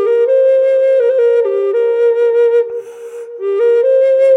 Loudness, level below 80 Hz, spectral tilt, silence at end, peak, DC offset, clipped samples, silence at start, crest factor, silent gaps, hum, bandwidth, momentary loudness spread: -12 LUFS; -78 dBFS; -3.5 dB/octave; 0 s; -2 dBFS; under 0.1%; under 0.1%; 0 s; 8 dB; none; none; 6 kHz; 12 LU